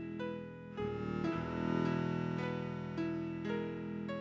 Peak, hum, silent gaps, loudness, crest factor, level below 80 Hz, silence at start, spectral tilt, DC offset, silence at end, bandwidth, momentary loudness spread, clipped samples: -22 dBFS; none; none; -39 LUFS; 16 dB; -60 dBFS; 0 s; -8 dB/octave; under 0.1%; 0 s; 7.6 kHz; 7 LU; under 0.1%